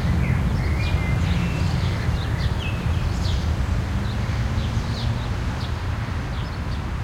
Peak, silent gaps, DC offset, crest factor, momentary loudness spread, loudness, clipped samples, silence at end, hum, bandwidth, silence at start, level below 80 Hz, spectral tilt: -10 dBFS; none; under 0.1%; 14 dB; 5 LU; -24 LUFS; under 0.1%; 0 s; none; 15 kHz; 0 s; -28 dBFS; -6.5 dB/octave